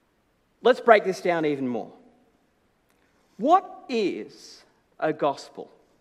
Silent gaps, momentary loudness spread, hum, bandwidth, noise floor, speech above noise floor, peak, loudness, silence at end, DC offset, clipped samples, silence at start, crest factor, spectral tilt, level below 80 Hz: none; 23 LU; none; 12.5 kHz; -67 dBFS; 44 dB; 0 dBFS; -24 LUFS; 0.35 s; under 0.1%; under 0.1%; 0.65 s; 26 dB; -5.5 dB/octave; -76 dBFS